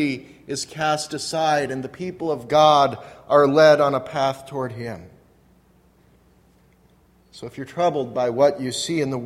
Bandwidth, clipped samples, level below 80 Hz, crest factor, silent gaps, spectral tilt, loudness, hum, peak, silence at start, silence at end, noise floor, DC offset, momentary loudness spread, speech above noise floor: 14 kHz; under 0.1%; -60 dBFS; 20 dB; none; -4.5 dB/octave; -20 LUFS; none; -2 dBFS; 0 s; 0 s; -57 dBFS; under 0.1%; 18 LU; 36 dB